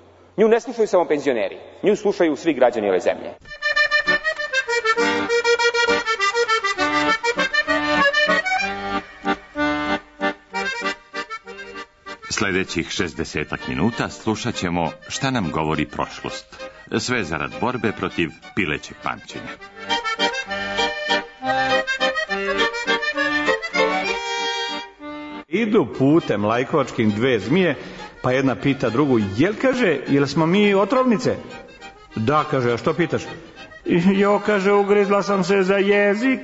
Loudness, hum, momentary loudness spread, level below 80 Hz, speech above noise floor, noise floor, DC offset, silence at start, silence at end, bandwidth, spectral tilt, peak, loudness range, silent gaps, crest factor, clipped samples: -20 LUFS; none; 13 LU; -52 dBFS; 22 dB; -42 dBFS; under 0.1%; 0.35 s; 0 s; 8 kHz; -5 dB/octave; -2 dBFS; 6 LU; none; 18 dB; under 0.1%